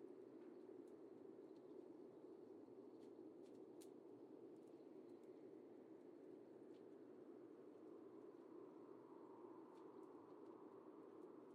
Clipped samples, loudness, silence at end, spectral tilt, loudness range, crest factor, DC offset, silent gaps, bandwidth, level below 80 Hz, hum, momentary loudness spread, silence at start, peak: under 0.1%; -62 LUFS; 0 s; -6.5 dB/octave; 1 LU; 14 dB; under 0.1%; none; 5.8 kHz; under -90 dBFS; none; 1 LU; 0 s; -48 dBFS